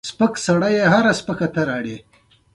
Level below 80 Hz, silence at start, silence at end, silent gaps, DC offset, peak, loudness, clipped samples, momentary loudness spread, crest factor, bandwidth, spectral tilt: -54 dBFS; 0.05 s; 0.55 s; none; under 0.1%; -2 dBFS; -18 LUFS; under 0.1%; 12 LU; 16 dB; 11.5 kHz; -5.5 dB/octave